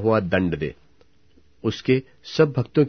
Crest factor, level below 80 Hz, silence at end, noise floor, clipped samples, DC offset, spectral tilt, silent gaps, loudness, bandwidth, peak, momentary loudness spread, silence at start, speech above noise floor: 18 dB; -50 dBFS; 0 s; -60 dBFS; under 0.1%; 0.2%; -7.5 dB/octave; none; -23 LUFS; 6.6 kHz; -6 dBFS; 9 LU; 0 s; 38 dB